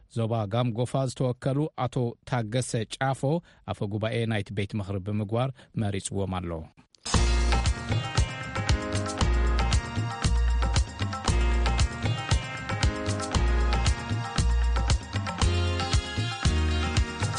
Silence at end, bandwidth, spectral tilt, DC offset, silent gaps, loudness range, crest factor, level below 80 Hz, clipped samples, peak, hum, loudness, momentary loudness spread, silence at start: 0 s; 11.5 kHz; -5 dB/octave; under 0.1%; none; 3 LU; 18 dB; -30 dBFS; under 0.1%; -8 dBFS; none; -28 LUFS; 6 LU; 0.15 s